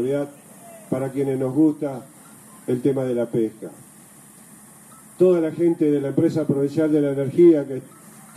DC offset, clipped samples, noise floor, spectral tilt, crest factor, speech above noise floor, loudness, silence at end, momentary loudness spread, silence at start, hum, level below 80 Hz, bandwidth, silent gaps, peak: under 0.1%; under 0.1%; -47 dBFS; -8 dB/octave; 16 dB; 27 dB; -21 LUFS; 0.15 s; 16 LU; 0 s; none; -68 dBFS; 14 kHz; none; -6 dBFS